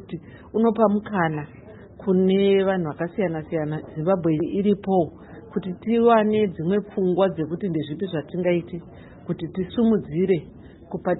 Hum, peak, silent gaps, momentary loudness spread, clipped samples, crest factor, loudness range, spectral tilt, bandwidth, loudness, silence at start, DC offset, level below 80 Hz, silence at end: none; -4 dBFS; none; 14 LU; under 0.1%; 18 dB; 3 LU; -12 dB/octave; 4.1 kHz; -23 LUFS; 0 s; under 0.1%; -54 dBFS; 0 s